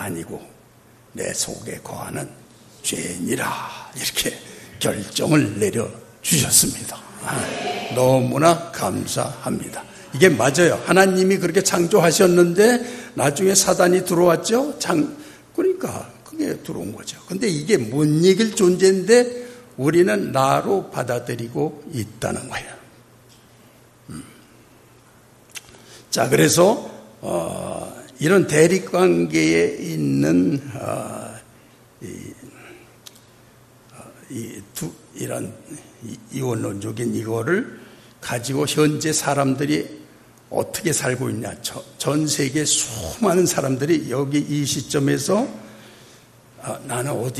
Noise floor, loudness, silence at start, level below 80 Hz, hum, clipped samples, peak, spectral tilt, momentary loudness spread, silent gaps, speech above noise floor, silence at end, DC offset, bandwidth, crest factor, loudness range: -51 dBFS; -20 LUFS; 0 s; -56 dBFS; none; under 0.1%; 0 dBFS; -4.5 dB/octave; 19 LU; none; 31 dB; 0 s; under 0.1%; 14 kHz; 20 dB; 14 LU